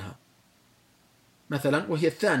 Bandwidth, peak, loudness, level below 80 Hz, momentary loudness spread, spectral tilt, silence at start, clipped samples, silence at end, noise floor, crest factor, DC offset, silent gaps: 16.5 kHz; -10 dBFS; -27 LUFS; -72 dBFS; 11 LU; -6 dB/octave; 0 s; under 0.1%; 0 s; -62 dBFS; 18 dB; under 0.1%; none